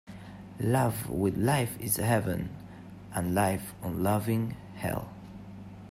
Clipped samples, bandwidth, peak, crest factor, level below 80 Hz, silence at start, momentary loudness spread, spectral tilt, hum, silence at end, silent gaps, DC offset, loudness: under 0.1%; 16 kHz; -12 dBFS; 18 dB; -54 dBFS; 0.05 s; 19 LU; -6 dB/octave; none; 0 s; none; under 0.1%; -30 LUFS